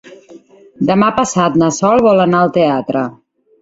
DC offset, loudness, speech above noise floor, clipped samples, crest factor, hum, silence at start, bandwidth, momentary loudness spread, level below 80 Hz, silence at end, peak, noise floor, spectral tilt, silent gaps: under 0.1%; -13 LUFS; 28 dB; under 0.1%; 14 dB; none; 0.05 s; 8 kHz; 9 LU; -50 dBFS; 0.5 s; 0 dBFS; -40 dBFS; -5.5 dB/octave; none